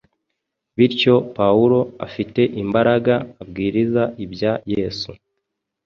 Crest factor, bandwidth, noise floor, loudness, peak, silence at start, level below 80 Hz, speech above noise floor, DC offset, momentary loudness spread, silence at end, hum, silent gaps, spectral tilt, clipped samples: 18 dB; 6.8 kHz; -78 dBFS; -19 LUFS; -2 dBFS; 0.8 s; -50 dBFS; 60 dB; under 0.1%; 12 LU; 0.7 s; none; none; -7.5 dB/octave; under 0.1%